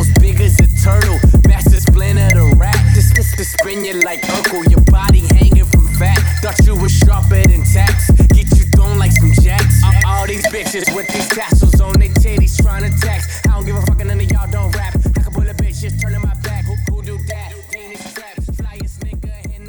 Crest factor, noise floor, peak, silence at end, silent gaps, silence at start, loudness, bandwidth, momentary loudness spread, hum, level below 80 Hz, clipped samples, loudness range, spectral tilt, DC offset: 10 dB; -31 dBFS; 0 dBFS; 0 s; none; 0 s; -12 LUFS; over 20 kHz; 15 LU; none; -14 dBFS; under 0.1%; 9 LU; -5.5 dB/octave; under 0.1%